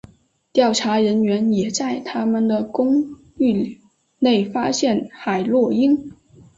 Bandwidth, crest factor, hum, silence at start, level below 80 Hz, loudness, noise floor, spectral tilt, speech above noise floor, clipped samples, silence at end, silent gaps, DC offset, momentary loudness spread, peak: 8 kHz; 16 dB; none; 0.55 s; -60 dBFS; -19 LUFS; -48 dBFS; -5 dB/octave; 30 dB; under 0.1%; 0.45 s; none; under 0.1%; 6 LU; -4 dBFS